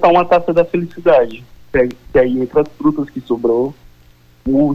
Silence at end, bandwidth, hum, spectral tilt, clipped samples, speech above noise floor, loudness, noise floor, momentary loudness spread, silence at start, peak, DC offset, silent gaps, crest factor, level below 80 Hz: 0 s; 6.8 kHz; 60 Hz at -50 dBFS; -8.5 dB/octave; under 0.1%; 33 dB; -15 LUFS; -47 dBFS; 9 LU; 0 s; -2 dBFS; under 0.1%; none; 12 dB; -40 dBFS